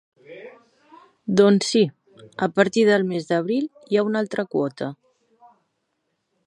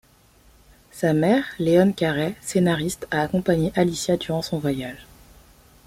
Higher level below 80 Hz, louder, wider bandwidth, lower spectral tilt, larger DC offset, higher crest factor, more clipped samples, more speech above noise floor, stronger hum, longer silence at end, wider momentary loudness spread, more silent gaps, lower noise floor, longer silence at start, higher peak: second, -68 dBFS vs -50 dBFS; about the same, -21 LUFS vs -22 LUFS; second, 11.5 kHz vs 16 kHz; about the same, -5.5 dB/octave vs -6 dB/octave; neither; about the same, 22 dB vs 18 dB; neither; first, 55 dB vs 33 dB; neither; first, 1.55 s vs 0.85 s; first, 19 LU vs 8 LU; neither; first, -74 dBFS vs -55 dBFS; second, 0.3 s vs 0.95 s; about the same, -2 dBFS vs -4 dBFS